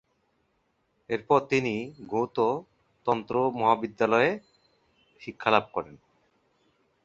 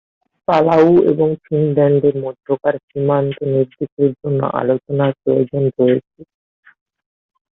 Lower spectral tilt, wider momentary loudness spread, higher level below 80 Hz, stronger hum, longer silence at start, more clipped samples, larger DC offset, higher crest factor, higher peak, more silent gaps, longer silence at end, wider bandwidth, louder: second, -6 dB/octave vs -10 dB/octave; first, 12 LU vs 9 LU; second, -66 dBFS vs -56 dBFS; neither; first, 1.1 s vs 0.5 s; neither; neither; first, 24 dB vs 16 dB; about the same, -4 dBFS vs -2 dBFS; second, none vs 2.83-2.88 s, 3.92-3.97 s; second, 1.1 s vs 1.3 s; first, 7.8 kHz vs 6.2 kHz; second, -27 LUFS vs -16 LUFS